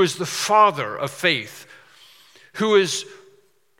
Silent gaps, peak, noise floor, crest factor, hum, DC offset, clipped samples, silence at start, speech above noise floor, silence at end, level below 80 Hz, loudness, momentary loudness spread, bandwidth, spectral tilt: none; -2 dBFS; -59 dBFS; 20 dB; none; under 0.1%; under 0.1%; 0 s; 39 dB; 0.65 s; -80 dBFS; -20 LUFS; 22 LU; 17 kHz; -3 dB/octave